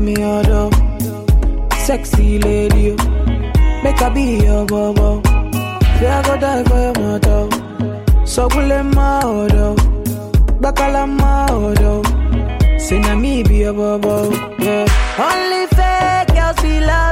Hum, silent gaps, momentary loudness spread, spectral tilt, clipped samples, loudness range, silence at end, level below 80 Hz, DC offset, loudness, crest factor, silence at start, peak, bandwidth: none; none; 4 LU; -6 dB/octave; under 0.1%; 1 LU; 0 s; -16 dBFS; under 0.1%; -15 LUFS; 10 dB; 0 s; -2 dBFS; 16 kHz